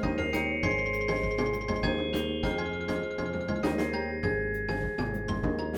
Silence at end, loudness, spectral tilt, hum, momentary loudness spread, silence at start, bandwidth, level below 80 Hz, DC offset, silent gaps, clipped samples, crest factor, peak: 0 s; -30 LUFS; -6.5 dB/octave; none; 4 LU; 0 s; 19.5 kHz; -40 dBFS; under 0.1%; none; under 0.1%; 14 dB; -14 dBFS